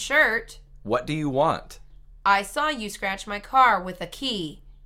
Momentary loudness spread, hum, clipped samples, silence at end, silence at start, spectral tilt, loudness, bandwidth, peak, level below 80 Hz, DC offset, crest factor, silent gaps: 12 LU; none; under 0.1%; 0.15 s; 0 s; -4 dB/octave; -24 LUFS; 16.5 kHz; -6 dBFS; -48 dBFS; under 0.1%; 20 dB; none